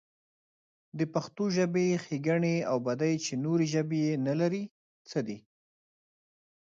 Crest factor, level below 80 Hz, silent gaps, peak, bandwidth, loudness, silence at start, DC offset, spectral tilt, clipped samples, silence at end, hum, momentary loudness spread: 16 dB; -76 dBFS; 4.71-5.05 s; -14 dBFS; 7.8 kHz; -30 LUFS; 0.95 s; under 0.1%; -6 dB/octave; under 0.1%; 1.25 s; none; 9 LU